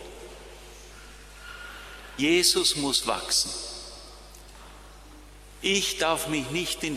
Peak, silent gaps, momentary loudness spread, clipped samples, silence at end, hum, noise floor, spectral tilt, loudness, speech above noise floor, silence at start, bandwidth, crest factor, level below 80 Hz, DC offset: -8 dBFS; none; 26 LU; under 0.1%; 0 s; 50 Hz at -50 dBFS; -47 dBFS; -2 dB/octave; -24 LUFS; 22 dB; 0 s; 15 kHz; 22 dB; -50 dBFS; under 0.1%